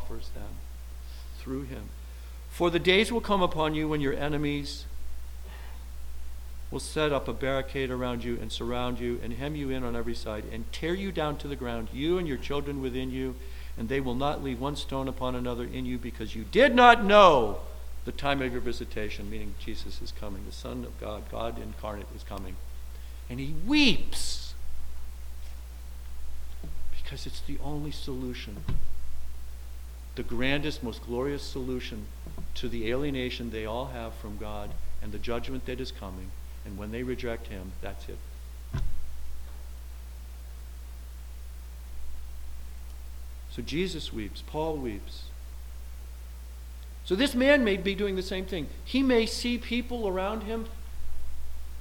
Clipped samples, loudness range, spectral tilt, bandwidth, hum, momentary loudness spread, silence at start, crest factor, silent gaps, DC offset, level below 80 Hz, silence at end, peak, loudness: under 0.1%; 17 LU; -5 dB/octave; 18 kHz; none; 19 LU; 0 s; 26 dB; none; under 0.1%; -38 dBFS; 0 s; -2 dBFS; -29 LUFS